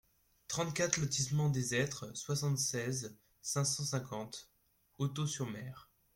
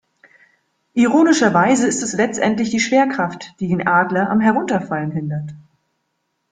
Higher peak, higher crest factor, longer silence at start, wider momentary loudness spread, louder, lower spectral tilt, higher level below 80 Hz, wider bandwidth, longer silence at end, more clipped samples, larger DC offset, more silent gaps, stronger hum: second, -12 dBFS vs -2 dBFS; first, 26 dB vs 16 dB; second, 0.5 s vs 0.95 s; about the same, 13 LU vs 11 LU; second, -36 LUFS vs -17 LUFS; about the same, -4 dB/octave vs -5 dB/octave; second, -68 dBFS vs -58 dBFS; first, 16.5 kHz vs 9.6 kHz; second, 0.35 s vs 0.9 s; neither; neither; neither; neither